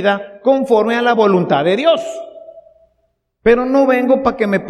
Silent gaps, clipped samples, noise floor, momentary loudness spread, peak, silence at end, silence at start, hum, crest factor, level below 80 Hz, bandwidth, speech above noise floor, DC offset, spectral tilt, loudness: none; under 0.1%; -65 dBFS; 6 LU; 0 dBFS; 0 s; 0 s; none; 14 dB; -46 dBFS; 12 kHz; 52 dB; under 0.1%; -6.5 dB/octave; -14 LUFS